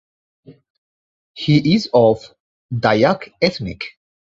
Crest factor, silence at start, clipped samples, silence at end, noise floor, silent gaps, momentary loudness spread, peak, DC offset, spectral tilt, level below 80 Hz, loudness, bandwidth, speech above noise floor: 18 dB; 0.5 s; under 0.1%; 0.4 s; under -90 dBFS; 0.70-1.34 s, 2.40-2.69 s; 14 LU; -2 dBFS; under 0.1%; -7 dB/octave; -50 dBFS; -17 LUFS; 7.8 kHz; over 74 dB